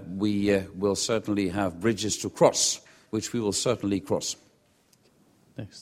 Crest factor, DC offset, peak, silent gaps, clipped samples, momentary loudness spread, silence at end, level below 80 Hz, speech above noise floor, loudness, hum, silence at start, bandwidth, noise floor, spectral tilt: 22 dB; under 0.1%; -6 dBFS; none; under 0.1%; 12 LU; 0 s; -58 dBFS; 38 dB; -26 LUFS; none; 0 s; 16 kHz; -64 dBFS; -4 dB/octave